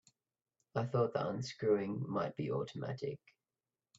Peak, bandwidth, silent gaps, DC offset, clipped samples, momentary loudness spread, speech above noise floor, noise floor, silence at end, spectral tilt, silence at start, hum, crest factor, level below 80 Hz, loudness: -20 dBFS; 7.8 kHz; none; under 0.1%; under 0.1%; 9 LU; over 53 dB; under -90 dBFS; 0.8 s; -7 dB/octave; 0.75 s; none; 18 dB; -76 dBFS; -38 LUFS